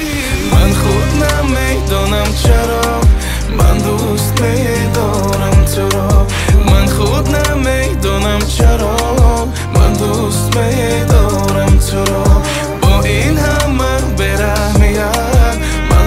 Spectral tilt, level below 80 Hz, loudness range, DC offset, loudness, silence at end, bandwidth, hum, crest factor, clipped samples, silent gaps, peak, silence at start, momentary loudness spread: -5.5 dB/octave; -14 dBFS; 1 LU; under 0.1%; -12 LUFS; 0 s; 16 kHz; none; 10 dB; under 0.1%; none; 0 dBFS; 0 s; 3 LU